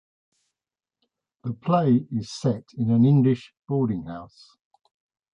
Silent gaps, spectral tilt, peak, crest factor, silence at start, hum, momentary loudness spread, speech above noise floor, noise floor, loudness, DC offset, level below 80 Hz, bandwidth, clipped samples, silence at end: none; -8.5 dB/octave; -8 dBFS; 16 dB; 1.45 s; none; 17 LU; over 67 dB; under -90 dBFS; -23 LUFS; under 0.1%; -62 dBFS; 9.2 kHz; under 0.1%; 1.1 s